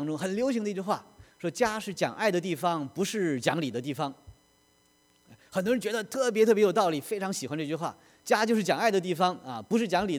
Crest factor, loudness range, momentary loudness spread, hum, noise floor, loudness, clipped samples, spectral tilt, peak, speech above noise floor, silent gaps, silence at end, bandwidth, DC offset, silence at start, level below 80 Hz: 20 dB; 5 LU; 10 LU; none; -66 dBFS; -28 LUFS; under 0.1%; -4.5 dB/octave; -8 dBFS; 38 dB; none; 0 s; 19.5 kHz; under 0.1%; 0 s; -66 dBFS